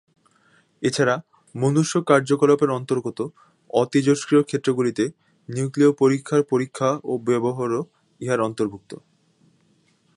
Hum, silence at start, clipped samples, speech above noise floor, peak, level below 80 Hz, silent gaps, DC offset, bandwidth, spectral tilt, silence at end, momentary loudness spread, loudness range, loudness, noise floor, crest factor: none; 0.8 s; under 0.1%; 41 dB; -2 dBFS; -68 dBFS; none; under 0.1%; 11.5 kHz; -6 dB/octave; 1.2 s; 13 LU; 4 LU; -22 LUFS; -62 dBFS; 20 dB